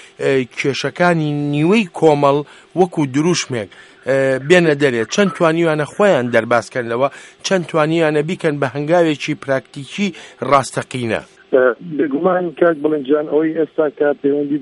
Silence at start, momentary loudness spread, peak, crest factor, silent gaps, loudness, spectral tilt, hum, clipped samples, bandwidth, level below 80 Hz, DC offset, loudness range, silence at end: 0.2 s; 8 LU; 0 dBFS; 16 dB; none; -16 LUFS; -5.5 dB/octave; none; under 0.1%; 11.5 kHz; -60 dBFS; under 0.1%; 3 LU; 0 s